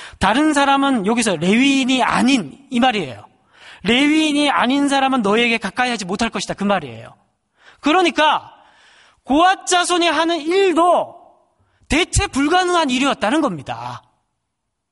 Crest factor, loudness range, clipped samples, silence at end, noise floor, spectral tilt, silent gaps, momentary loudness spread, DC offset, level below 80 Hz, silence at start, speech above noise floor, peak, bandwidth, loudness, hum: 16 dB; 3 LU; under 0.1%; 0.95 s; -76 dBFS; -3.5 dB/octave; none; 9 LU; under 0.1%; -40 dBFS; 0 s; 59 dB; -2 dBFS; 11.5 kHz; -16 LUFS; none